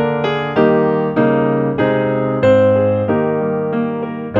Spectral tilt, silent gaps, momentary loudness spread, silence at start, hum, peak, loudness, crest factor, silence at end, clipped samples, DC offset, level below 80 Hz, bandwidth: -9 dB/octave; none; 6 LU; 0 s; none; -2 dBFS; -15 LUFS; 12 dB; 0 s; under 0.1%; under 0.1%; -48 dBFS; 7.4 kHz